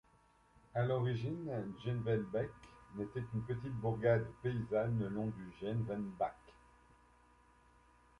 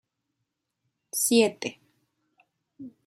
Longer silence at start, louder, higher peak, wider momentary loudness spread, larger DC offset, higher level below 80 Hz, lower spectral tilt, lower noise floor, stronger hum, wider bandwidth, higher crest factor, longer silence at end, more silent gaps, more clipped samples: second, 0.75 s vs 1.15 s; second, -39 LUFS vs -25 LUFS; second, -20 dBFS vs -10 dBFS; second, 9 LU vs 25 LU; neither; first, -64 dBFS vs -78 dBFS; first, -9 dB/octave vs -2.5 dB/octave; second, -69 dBFS vs -82 dBFS; neither; second, 6.6 kHz vs 16 kHz; about the same, 20 dB vs 22 dB; first, 1.7 s vs 0.15 s; neither; neither